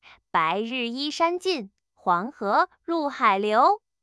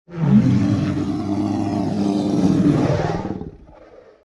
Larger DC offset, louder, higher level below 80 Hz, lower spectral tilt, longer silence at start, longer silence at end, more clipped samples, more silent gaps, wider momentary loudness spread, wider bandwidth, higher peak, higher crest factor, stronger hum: neither; second, -24 LUFS vs -19 LUFS; second, -74 dBFS vs -42 dBFS; second, -4 dB/octave vs -8 dB/octave; first, 0.35 s vs 0.1 s; second, 0.25 s vs 0.45 s; neither; neither; about the same, 8 LU vs 10 LU; about the same, 12 kHz vs 11 kHz; about the same, -6 dBFS vs -4 dBFS; about the same, 18 dB vs 16 dB; neither